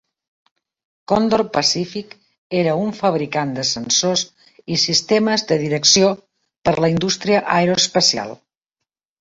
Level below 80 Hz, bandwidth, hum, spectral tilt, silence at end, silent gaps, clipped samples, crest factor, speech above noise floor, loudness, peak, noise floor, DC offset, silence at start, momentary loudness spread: -54 dBFS; 8 kHz; none; -3.5 dB/octave; 0.85 s; 2.38-2.50 s, 6.58-6.62 s; under 0.1%; 20 dB; 64 dB; -17 LUFS; 0 dBFS; -82 dBFS; under 0.1%; 1.1 s; 9 LU